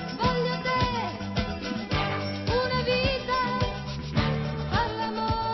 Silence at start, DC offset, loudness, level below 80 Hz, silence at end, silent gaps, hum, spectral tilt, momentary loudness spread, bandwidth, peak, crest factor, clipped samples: 0 s; under 0.1%; -27 LUFS; -40 dBFS; 0 s; none; none; -6 dB/octave; 5 LU; 6.2 kHz; -12 dBFS; 16 dB; under 0.1%